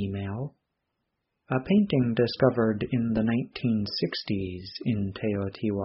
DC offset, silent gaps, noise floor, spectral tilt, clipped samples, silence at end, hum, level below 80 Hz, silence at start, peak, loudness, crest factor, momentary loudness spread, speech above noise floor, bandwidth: under 0.1%; none; -80 dBFS; -6 dB/octave; under 0.1%; 0 s; none; -56 dBFS; 0 s; -8 dBFS; -27 LUFS; 20 dB; 10 LU; 54 dB; 5.8 kHz